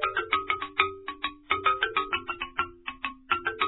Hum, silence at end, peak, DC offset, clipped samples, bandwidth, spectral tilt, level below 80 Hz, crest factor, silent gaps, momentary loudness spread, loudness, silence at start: none; 0 s; -6 dBFS; under 0.1%; under 0.1%; 4.1 kHz; -5.5 dB/octave; -56 dBFS; 24 dB; none; 10 LU; -29 LUFS; 0 s